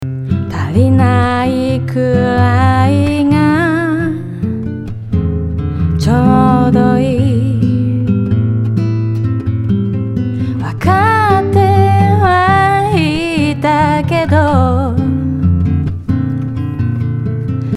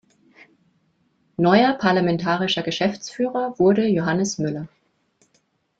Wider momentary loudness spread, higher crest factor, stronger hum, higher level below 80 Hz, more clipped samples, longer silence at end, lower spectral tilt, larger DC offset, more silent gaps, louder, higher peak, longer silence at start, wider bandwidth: about the same, 8 LU vs 10 LU; second, 12 dB vs 20 dB; neither; first, -34 dBFS vs -60 dBFS; neither; second, 0 s vs 1.15 s; first, -8 dB/octave vs -5.5 dB/octave; neither; neither; first, -13 LUFS vs -20 LUFS; about the same, 0 dBFS vs -2 dBFS; second, 0 s vs 1.4 s; first, 12 kHz vs 8 kHz